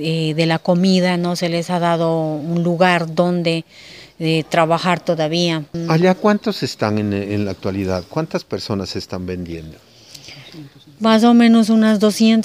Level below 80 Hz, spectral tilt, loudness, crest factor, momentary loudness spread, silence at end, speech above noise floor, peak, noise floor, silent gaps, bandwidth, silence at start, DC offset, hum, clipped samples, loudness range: -54 dBFS; -6 dB/octave; -17 LUFS; 16 dB; 13 LU; 0 s; 23 dB; 0 dBFS; -40 dBFS; none; 15.5 kHz; 0 s; under 0.1%; none; under 0.1%; 7 LU